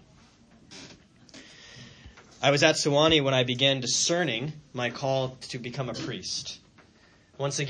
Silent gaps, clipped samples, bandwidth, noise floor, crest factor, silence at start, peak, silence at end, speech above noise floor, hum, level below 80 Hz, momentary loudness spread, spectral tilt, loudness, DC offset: none; under 0.1%; 10.5 kHz; -59 dBFS; 24 dB; 0.7 s; -4 dBFS; 0 s; 33 dB; none; -58 dBFS; 25 LU; -3.5 dB/octave; -26 LUFS; under 0.1%